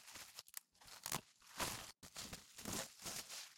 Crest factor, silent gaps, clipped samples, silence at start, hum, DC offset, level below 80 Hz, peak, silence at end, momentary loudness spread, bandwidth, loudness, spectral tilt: 26 dB; none; under 0.1%; 0 s; none; under 0.1%; -70 dBFS; -24 dBFS; 0 s; 10 LU; 16.5 kHz; -48 LUFS; -1.5 dB/octave